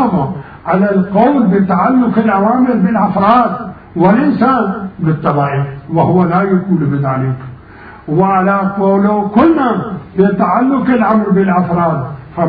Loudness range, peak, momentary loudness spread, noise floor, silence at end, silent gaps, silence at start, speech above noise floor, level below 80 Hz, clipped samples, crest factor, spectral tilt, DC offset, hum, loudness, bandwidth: 3 LU; 0 dBFS; 9 LU; -35 dBFS; 0 s; none; 0 s; 23 dB; -44 dBFS; under 0.1%; 12 dB; -11.5 dB/octave; under 0.1%; none; -12 LUFS; 4.9 kHz